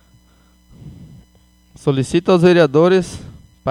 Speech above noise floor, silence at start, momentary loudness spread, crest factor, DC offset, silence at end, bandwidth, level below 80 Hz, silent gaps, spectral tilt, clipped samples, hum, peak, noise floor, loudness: 39 dB; 0.85 s; 16 LU; 18 dB; under 0.1%; 0 s; 11.5 kHz; -48 dBFS; none; -6.5 dB/octave; under 0.1%; none; 0 dBFS; -52 dBFS; -14 LUFS